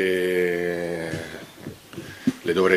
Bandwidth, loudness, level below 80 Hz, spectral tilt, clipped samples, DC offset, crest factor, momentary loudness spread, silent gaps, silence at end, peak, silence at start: 15.5 kHz; -25 LUFS; -60 dBFS; -5.5 dB/octave; under 0.1%; under 0.1%; 20 dB; 17 LU; none; 0 s; -4 dBFS; 0 s